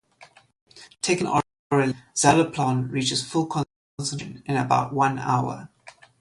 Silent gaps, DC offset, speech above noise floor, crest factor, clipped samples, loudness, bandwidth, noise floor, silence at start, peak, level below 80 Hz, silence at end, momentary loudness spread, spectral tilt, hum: 0.61-0.66 s, 1.59-1.70 s, 3.76-3.98 s; under 0.1%; 30 dB; 20 dB; under 0.1%; -24 LUFS; 11.5 kHz; -53 dBFS; 0.2 s; -4 dBFS; -58 dBFS; 0.3 s; 11 LU; -4.5 dB/octave; none